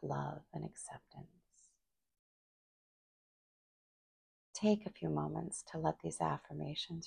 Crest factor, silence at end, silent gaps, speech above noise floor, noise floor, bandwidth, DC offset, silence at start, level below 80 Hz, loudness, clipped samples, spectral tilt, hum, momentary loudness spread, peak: 22 dB; 0 s; 2.19-4.53 s; 39 dB; -78 dBFS; 11 kHz; under 0.1%; 0 s; -70 dBFS; -40 LUFS; under 0.1%; -5.5 dB/octave; none; 16 LU; -20 dBFS